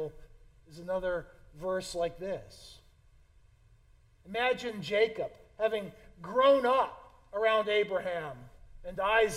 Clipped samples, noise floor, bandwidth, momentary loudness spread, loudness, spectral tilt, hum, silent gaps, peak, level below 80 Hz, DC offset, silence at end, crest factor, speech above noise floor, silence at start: under 0.1%; -62 dBFS; 14 kHz; 18 LU; -31 LUFS; -4 dB/octave; none; none; -14 dBFS; -58 dBFS; under 0.1%; 0 s; 18 dB; 32 dB; 0 s